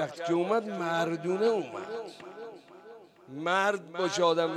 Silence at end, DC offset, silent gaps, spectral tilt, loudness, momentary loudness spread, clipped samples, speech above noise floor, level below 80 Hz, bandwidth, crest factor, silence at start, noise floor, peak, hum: 0 s; under 0.1%; none; -4.5 dB/octave; -29 LUFS; 19 LU; under 0.1%; 22 dB; -80 dBFS; 13 kHz; 18 dB; 0 s; -51 dBFS; -12 dBFS; none